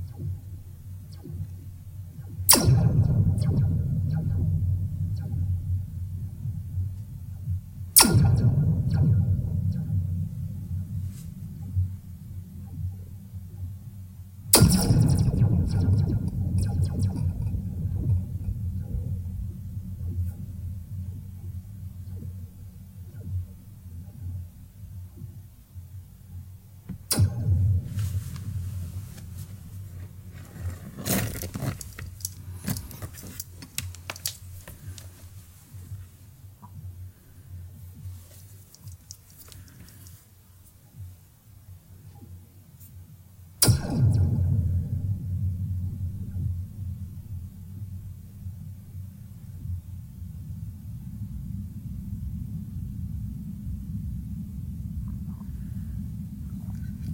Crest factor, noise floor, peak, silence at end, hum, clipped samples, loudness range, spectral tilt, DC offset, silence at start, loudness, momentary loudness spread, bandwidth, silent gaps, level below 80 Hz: 28 dB; -53 dBFS; 0 dBFS; 0 s; none; under 0.1%; 22 LU; -4.5 dB/octave; under 0.1%; 0 s; -27 LUFS; 22 LU; 16.5 kHz; none; -42 dBFS